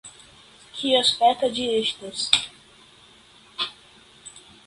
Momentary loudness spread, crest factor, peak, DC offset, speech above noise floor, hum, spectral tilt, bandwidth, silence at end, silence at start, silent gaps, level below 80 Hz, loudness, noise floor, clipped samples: 24 LU; 26 dB; 0 dBFS; under 0.1%; 30 dB; none; -1.5 dB/octave; 11.5 kHz; 0.25 s; 0.05 s; none; -62 dBFS; -22 LUFS; -52 dBFS; under 0.1%